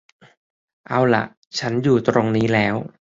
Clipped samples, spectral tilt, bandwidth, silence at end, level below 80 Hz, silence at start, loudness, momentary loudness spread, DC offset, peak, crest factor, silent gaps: under 0.1%; -6.5 dB/octave; 7.8 kHz; 0.2 s; -54 dBFS; 0.9 s; -19 LUFS; 7 LU; under 0.1%; -2 dBFS; 18 dB; 1.37-1.42 s